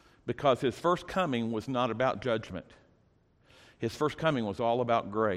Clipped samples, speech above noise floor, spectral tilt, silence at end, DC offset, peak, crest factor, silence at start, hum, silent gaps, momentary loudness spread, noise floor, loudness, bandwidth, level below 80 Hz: under 0.1%; 37 dB; -6.5 dB/octave; 0 s; under 0.1%; -12 dBFS; 18 dB; 0.25 s; none; none; 10 LU; -67 dBFS; -30 LUFS; 14.5 kHz; -62 dBFS